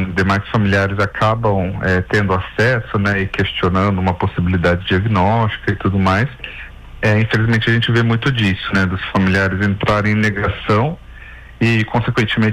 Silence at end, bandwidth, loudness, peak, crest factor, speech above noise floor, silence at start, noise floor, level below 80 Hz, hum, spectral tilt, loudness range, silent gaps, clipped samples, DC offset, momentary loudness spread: 0 s; 10 kHz; -16 LUFS; -6 dBFS; 10 dB; 20 dB; 0 s; -36 dBFS; -36 dBFS; none; -7 dB/octave; 1 LU; none; under 0.1%; under 0.1%; 4 LU